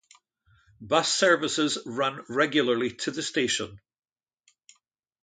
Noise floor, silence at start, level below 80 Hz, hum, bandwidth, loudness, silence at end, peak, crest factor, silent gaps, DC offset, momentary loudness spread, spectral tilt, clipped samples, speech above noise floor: -72 dBFS; 0.8 s; -68 dBFS; none; 9.6 kHz; -25 LUFS; 1.45 s; -8 dBFS; 20 dB; none; under 0.1%; 8 LU; -2.5 dB/octave; under 0.1%; 46 dB